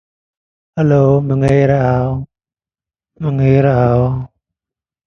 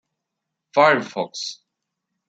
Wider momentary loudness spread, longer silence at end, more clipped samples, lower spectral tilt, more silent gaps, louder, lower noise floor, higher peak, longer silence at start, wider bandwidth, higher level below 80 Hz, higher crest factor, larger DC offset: about the same, 13 LU vs 14 LU; about the same, 0.8 s vs 0.75 s; neither; first, -10 dB/octave vs -3.5 dB/octave; neither; first, -14 LUFS vs -20 LUFS; first, under -90 dBFS vs -81 dBFS; about the same, 0 dBFS vs -2 dBFS; about the same, 0.75 s vs 0.75 s; second, 6.6 kHz vs 8 kHz; first, -40 dBFS vs -74 dBFS; second, 14 dB vs 22 dB; neither